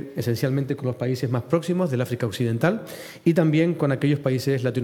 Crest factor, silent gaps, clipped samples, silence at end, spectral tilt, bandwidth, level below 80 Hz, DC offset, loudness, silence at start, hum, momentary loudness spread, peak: 16 dB; none; under 0.1%; 0 s; -7.5 dB/octave; 17.5 kHz; -66 dBFS; under 0.1%; -23 LUFS; 0 s; none; 6 LU; -6 dBFS